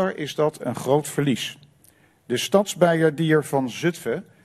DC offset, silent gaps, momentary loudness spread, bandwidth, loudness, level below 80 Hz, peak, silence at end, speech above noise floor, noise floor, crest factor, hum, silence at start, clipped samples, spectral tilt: under 0.1%; none; 10 LU; 14 kHz; -23 LUFS; -64 dBFS; -2 dBFS; 0.2 s; 35 dB; -57 dBFS; 20 dB; none; 0 s; under 0.1%; -5 dB/octave